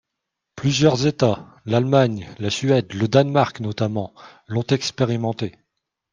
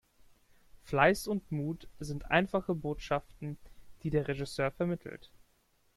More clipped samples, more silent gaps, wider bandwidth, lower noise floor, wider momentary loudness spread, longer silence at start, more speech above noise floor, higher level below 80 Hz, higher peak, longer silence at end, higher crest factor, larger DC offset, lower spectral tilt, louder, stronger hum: neither; neither; second, 9.4 kHz vs 14.5 kHz; first, -81 dBFS vs -71 dBFS; second, 11 LU vs 17 LU; second, 0.55 s vs 0.75 s; first, 61 dB vs 38 dB; about the same, -56 dBFS vs -54 dBFS; first, 0 dBFS vs -10 dBFS; second, 0.65 s vs 0.8 s; about the same, 20 dB vs 24 dB; neither; about the same, -6 dB/octave vs -6 dB/octave; first, -21 LUFS vs -33 LUFS; neither